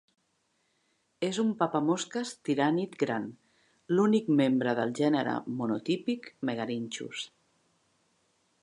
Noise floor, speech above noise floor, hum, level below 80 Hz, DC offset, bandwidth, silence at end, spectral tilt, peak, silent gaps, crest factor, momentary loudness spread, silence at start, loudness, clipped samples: -75 dBFS; 46 dB; none; -80 dBFS; under 0.1%; 11 kHz; 1.35 s; -5.5 dB/octave; -10 dBFS; none; 20 dB; 10 LU; 1.2 s; -30 LUFS; under 0.1%